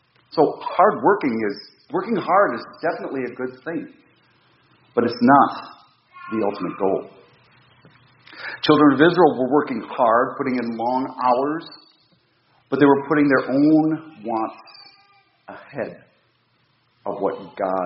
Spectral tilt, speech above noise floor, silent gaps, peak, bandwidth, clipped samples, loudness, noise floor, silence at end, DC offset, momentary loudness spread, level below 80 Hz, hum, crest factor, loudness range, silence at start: -4.5 dB/octave; 44 dB; none; 0 dBFS; 5.8 kHz; under 0.1%; -20 LUFS; -64 dBFS; 0 s; under 0.1%; 17 LU; -66 dBFS; none; 20 dB; 8 LU; 0.35 s